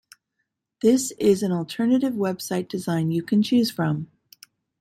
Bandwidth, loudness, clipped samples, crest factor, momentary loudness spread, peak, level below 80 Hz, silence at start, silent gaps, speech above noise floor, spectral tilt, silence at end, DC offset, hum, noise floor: 16 kHz; -23 LUFS; under 0.1%; 16 dB; 7 LU; -8 dBFS; -64 dBFS; 0.85 s; none; 56 dB; -6 dB/octave; 0.75 s; under 0.1%; none; -78 dBFS